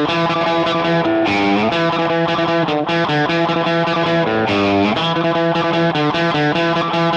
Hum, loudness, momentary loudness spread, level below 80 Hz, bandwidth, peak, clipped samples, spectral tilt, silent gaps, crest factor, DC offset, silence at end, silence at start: none; -16 LUFS; 1 LU; -52 dBFS; 8.2 kHz; -6 dBFS; under 0.1%; -6 dB/octave; none; 10 dB; under 0.1%; 0 s; 0 s